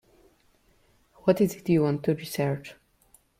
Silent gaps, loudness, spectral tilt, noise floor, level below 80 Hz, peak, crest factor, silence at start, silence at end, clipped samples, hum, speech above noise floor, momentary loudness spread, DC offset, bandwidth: none; -26 LUFS; -7 dB/octave; -64 dBFS; -62 dBFS; -8 dBFS; 20 dB; 1.25 s; 0.65 s; under 0.1%; none; 39 dB; 8 LU; under 0.1%; 16.5 kHz